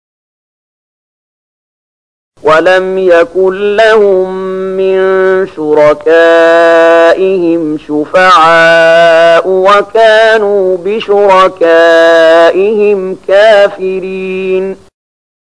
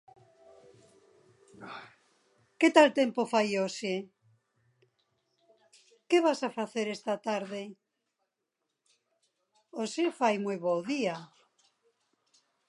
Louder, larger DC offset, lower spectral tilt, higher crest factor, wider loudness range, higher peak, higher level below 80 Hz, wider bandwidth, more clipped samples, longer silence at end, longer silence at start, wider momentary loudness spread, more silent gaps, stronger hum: first, -6 LUFS vs -29 LUFS; first, 0.7% vs under 0.1%; about the same, -4.5 dB/octave vs -4.5 dB/octave; second, 6 dB vs 26 dB; second, 4 LU vs 8 LU; first, 0 dBFS vs -6 dBFS; first, -48 dBFS vs -86 dBFS; about the same, 10.5 kHz vs 11.5 kHz; first, 0.5% vs under 0.1%; second, 0.75 s vs 1.45 s; first, 2.45 s vs 1.6 s; second, 10 LU vs 22 LU; neither; neither